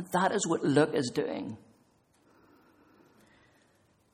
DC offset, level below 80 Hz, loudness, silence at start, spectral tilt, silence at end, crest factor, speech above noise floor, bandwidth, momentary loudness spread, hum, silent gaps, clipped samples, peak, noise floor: under 0.1%; -72 dBFS; -29 LUFS; 0 s; -5 dB/octave; 2.55 s; 22 dB; 39 dB; 16 kHz; 15 LU; none; none; under 0.1%; -10 dBFS; -67 dBFS